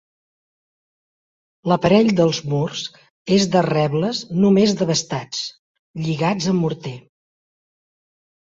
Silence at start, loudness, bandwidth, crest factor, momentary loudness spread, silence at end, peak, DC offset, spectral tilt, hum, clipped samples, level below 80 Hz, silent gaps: 1.65 s; -19 LUFS; 7.8 kHz; 18 dB; 16 LU; 1.45 s; -2 dBFS; under 0.1%; -5.5 dB/octave; none; under 0.1%; -56 dBFS; 3.10-3.25 s, 5.59-5.94 s